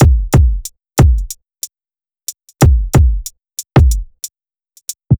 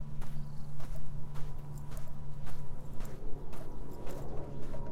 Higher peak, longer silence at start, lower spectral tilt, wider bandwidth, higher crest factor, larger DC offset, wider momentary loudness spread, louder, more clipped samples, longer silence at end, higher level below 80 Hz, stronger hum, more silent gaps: first, 0 dBFS vs -20 dBFS; about the same, 0 s vs 0 s; about the same, -6 dB/octave vs -7 dB/octave; first, over 20 kHz vs 8 kHz; about the same, 14 dB vs 10 dB; neither; first, 16 LU vs 3 LU; first, -13 LUFS vs -46 LUFS; neither; about the same, 0.05 s vs 0 s; first, -16 dBFS vs -42 dBFS; neither; neither